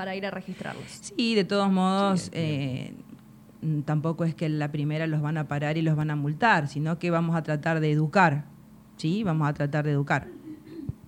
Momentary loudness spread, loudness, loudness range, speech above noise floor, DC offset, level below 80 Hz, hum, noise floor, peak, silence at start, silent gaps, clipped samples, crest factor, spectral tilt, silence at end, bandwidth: 14 LU; -26 LUFS; 4 LU; 23 dB; under 0.1%; -60 dBFS; none; -49 dBFS; -6 dBFS; 0 s; none; under 0.1%; 20 dB; -6.5 dB/octave; 0.15 s; 11 kHz